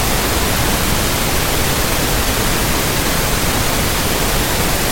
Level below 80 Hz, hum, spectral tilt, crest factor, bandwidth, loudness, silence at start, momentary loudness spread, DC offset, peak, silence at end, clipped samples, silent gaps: -22 dBFS; none; -3 dB/octave; 12 dB; 17 kHz; -15 LUFS; 0 s; 0 LU; under 0.1%; -2 dBFS; 0 s; under 0.1%; none